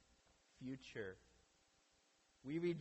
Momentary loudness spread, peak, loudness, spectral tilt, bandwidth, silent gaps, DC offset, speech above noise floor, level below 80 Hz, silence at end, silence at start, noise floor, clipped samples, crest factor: 14 LU; -32 dBFS; -49 LUFS; -7 dB/octave; 8.2 kHz; none; under 0.1%; 31 dB; -78 dBFS; 0 s; 0.6 s; -77 dBFS; under 0.1%; 18 dB